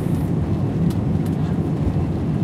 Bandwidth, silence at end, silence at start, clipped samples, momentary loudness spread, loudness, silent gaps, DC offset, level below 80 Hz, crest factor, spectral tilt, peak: 13.5 kHz; 0 s; 0 s; under 0.1%; 1 LU; -21 LUFS; none; under 0.1%; -34 dBFS; 12 dB; -9 dB/octave; -8 dBFS